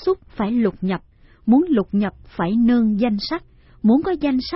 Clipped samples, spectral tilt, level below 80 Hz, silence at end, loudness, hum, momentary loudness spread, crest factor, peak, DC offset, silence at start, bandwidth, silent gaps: under 0.1%; -10.5 dB/octave; -46 dBFS; 0 s; -20 LUFS; none; 10 LU; 14 dB; -4 dBFS; under 0.1%; 0 s; 5.8 kHz; none